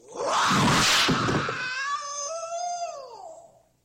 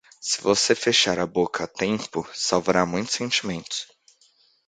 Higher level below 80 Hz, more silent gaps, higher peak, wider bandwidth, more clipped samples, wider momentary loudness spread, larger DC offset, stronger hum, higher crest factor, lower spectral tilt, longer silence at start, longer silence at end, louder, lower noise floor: first, -52 dBFS vs -58 dBFS; neither; second, -12 dBFS vs -2 dBFS; first, 16 kHz vs 9.6 kHz; neither; first, 16 LU vs 11 LU; neither; neither; second, 14 dB vs 22 dB; about the same, -3 dB/octave vs -2.5 dB/octave; about the same, 0.1 s vs 0.2 s; second, 0.45 s vs 0.85 s; about the same, -24 LUFS vs -23 LUFS; second, -52 dBFS vs -61 dBFS